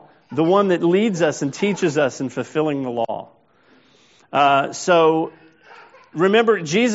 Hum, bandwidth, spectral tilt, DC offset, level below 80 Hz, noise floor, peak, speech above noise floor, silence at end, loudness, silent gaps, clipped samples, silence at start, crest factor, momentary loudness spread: none; 8 kHz; -4.5 dB/octave; under 0.1%; -68 dBFS; -55 dBFS; -2 dBFS; 37 dB; 0 s; -19 LUFS; none; under 0.1%; 0.3 s; 18 dB; 11 LU